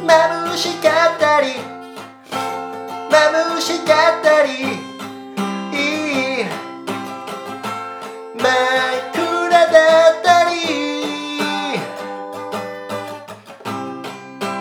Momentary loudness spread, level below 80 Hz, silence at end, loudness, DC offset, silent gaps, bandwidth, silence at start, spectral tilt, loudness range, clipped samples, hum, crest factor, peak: 17 LU; -70 dBFS; 0 s; -17 LUFS; under 0.1%; none; 17.5 kHz; 0 s; -3 dB/octave; 9 LU; under 0.1%; none; 18 dB; 0 dBFS